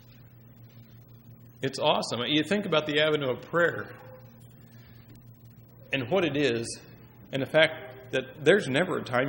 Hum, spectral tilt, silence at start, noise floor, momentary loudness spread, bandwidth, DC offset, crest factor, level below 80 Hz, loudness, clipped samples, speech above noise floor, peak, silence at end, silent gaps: none; -4.5 dB/octave; 0.2 s; -52 dBFS; 14 LU; 16 kHz; under 0.1%; 24 dB; -64 dBFS; -27 LUFS; under 0.1%; 25 dB; -4 dBFS; 0 s; none